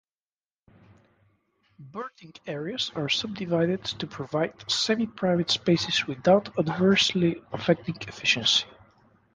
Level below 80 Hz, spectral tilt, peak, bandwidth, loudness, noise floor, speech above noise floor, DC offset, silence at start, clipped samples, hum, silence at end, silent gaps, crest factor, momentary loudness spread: -62 dBFS; -4.5 dB/octave; -6 dBFS; 10 kHz; -25 LUFS; under -90 dBFS; over 64 dB; under 0.1%; 1.8 s; under 0.1%; none; 0.65 s; none; 20 dB; 16 LU